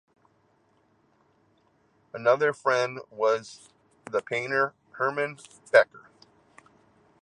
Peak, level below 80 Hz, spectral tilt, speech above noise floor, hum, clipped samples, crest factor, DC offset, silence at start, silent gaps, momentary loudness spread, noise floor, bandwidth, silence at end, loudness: -4 dBFS; -78 dBFS; -4 dB/octave; 41 dB; none; under 0.1%; 24 dB; under 0.1%; 2.15 s; none; 11 LU; -66 dBFS; 10.5 kHz; 1.25 s; -26 LUFS